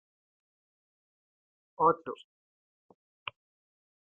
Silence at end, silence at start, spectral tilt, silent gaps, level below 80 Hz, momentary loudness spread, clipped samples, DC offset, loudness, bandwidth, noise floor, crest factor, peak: 1.9 s; 1.8 s; -4 dB/octave; none; -78 dBFS; 17 LU; under 0.1%; under 0.1%; -29 LUFS; 3.8 kHz; under -90 dBFS; 26 dB; -12 dBFS